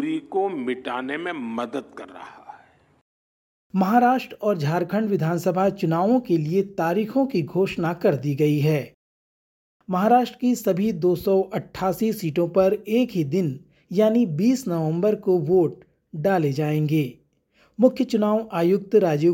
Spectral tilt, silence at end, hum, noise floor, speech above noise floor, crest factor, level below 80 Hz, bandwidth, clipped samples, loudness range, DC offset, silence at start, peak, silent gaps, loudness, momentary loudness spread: -7.5 dB/octave; 0 s; none; -62 dBFS; 40 dB; 18 dB; -62 dBFS; 17 kHz; under 0.1%; 4 LU; under 0.1%; 0 s; -4 dBFS; 3.01-3.70 s, 8.94-9.80 s; -22 LUFS; 10 LU